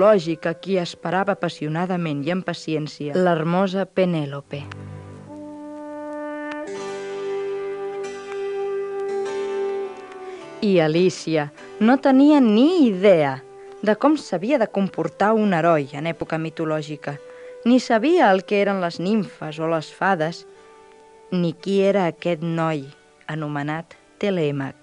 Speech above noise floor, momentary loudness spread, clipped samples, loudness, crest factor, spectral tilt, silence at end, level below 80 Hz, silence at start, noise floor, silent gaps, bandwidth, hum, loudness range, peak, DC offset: 28 dB; 17 LU; under 0.1%; -21 LUFS; 18 dB; -6.5 dB/octave; 0.1 s; -66 dBFS; 0 s; -48 dBFS; none; 10.5 kHz; none; 11 LU; -4 dBFS; under 0.1%